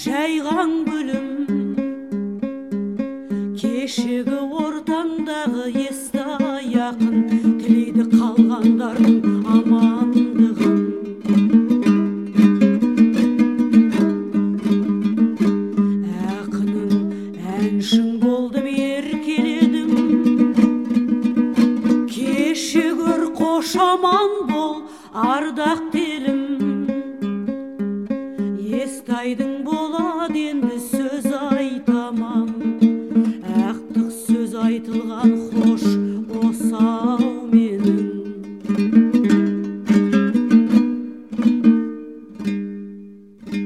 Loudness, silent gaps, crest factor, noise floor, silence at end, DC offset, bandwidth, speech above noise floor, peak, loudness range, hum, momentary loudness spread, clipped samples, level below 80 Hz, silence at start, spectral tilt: -19 LUFS; none; 16 dB; -40 dBFS; 0 s; 0.1%; 13.5 kHz; 19 dB; -2 dBFS; 7 LU; none; 10 LU; under 0.1%; -56 dBFS; 0 s; -6.5 dB/octave